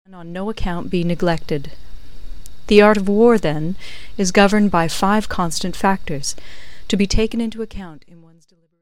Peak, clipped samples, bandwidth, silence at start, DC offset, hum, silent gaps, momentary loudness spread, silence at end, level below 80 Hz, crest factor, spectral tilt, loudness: 0 dBFS; under 0.1%; 16 kHz; 0.05 s; 6%; none; none; 18 LU; 0 s; -32 dBFS; 18 dB; -5 dB/octave; -18 LUFS